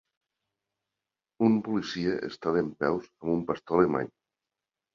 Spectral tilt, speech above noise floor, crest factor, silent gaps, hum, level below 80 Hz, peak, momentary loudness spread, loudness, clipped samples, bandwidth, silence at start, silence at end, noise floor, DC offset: -7 dB/octave; 62 dB; 22 dB; none; none; -62 dBFS; -8 dBFS; 7 LU; -28 LUFS; under 0.1%; 7.2 kHz; 1.4 s; 0.9 s; -89 dBFS; under 0.1%